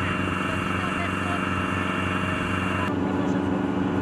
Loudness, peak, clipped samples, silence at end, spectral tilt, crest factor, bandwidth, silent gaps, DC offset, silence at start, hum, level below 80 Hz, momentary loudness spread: -25 LUFS; -12 dBFS; under 0.1%; 0 s; -6 dB/octave; 12 dB; 13 kHz; none; under 0.1%; 0 s; none; -48 dBFS; 1 LU